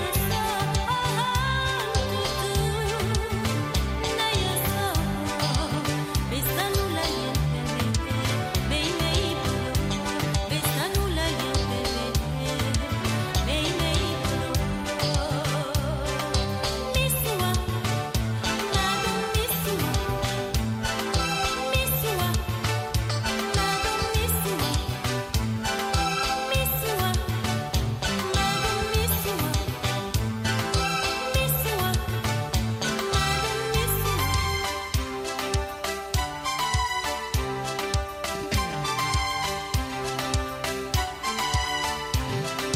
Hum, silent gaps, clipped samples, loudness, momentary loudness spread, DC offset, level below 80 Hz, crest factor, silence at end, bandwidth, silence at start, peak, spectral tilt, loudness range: none; none; under 0.1%; -26 LUFS; 4 LU; under 0.1%; -34 dBFS; 16 dB; 0 s; 16 kHz; 0 s; -10 dBFS; -4 dB/octave; 2 LU